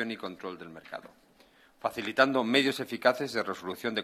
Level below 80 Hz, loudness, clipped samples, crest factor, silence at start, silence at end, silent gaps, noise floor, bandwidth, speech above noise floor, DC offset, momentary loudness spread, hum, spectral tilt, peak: -74 dBFS; -29 LUFS; under 0.1%; 22 dB; 0 s; 0 s; none; -61 dBFS; 14.5 kHz; 31 dB; under 0.1%; 18 LU; none; -4 dB/octave; -8 dBFS